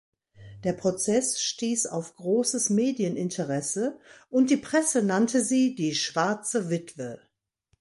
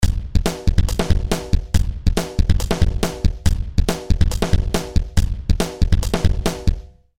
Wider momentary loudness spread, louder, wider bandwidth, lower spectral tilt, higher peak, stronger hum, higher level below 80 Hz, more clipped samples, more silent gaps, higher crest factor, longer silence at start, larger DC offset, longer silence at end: first, 9 LU vs 3 LU; second, -26 LUFS vs -21 LUFS; second, 11.5 kHz vs 16.5 kHz; second, -4 dB/octave vs -5.5 dB/octave; second, -10 dBFS vs -2 dBFS; neither; second, -68 dBFS vs -20 dBFS; neither; neither; about the same, 16 dB vs 14 dB; first, 0.4 s vs 0 s; second, under 0.1% vs 4%; first, 0.65 s vs 0 s